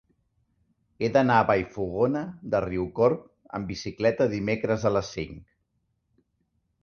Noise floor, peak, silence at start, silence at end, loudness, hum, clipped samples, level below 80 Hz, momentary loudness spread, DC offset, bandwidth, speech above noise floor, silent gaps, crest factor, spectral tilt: -75 dBFS; -6 dBFS; 1 s; 1.4 s; -26 LUFS; none; under 0.1%; -52 dBFS; 13 LU; under 0.1%; 6.8 kHz; 49 dB; none; 20 dB; -6.5 dB/octave